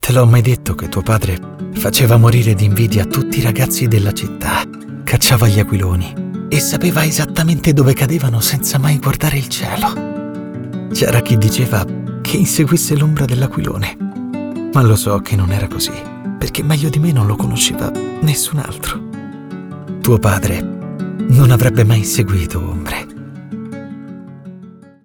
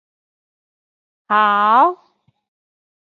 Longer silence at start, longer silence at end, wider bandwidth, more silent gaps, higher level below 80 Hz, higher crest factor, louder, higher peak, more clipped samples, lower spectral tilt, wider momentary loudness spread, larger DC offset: second, 0 s vs 1.3 s; second, 0.35 s vs 1.15 s; first, over 20 kHz vs 7 kHz; neither; first, -34 dBFS vs -78 dBFS; second, 12 dB vs 18 dB; about the same, -14 LUFS vs -14 LUFS; about the same, -2 dBFS vs -2 dBFS; neither; about the same, -5 dB/octave vs -5.5 dB/octave; first, 16 LU vs 8 LU; neither